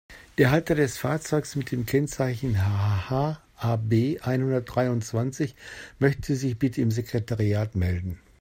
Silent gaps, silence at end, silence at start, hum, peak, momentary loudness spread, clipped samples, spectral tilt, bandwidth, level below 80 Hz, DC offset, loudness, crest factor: none; 0.25 s; 0.1 s; none; -6 dBFS; 7 LU; under 0.1%; -7 dB/octave; 16 kHz; -50 dBFS; under 0.1%; -26 LUFS; 20 dB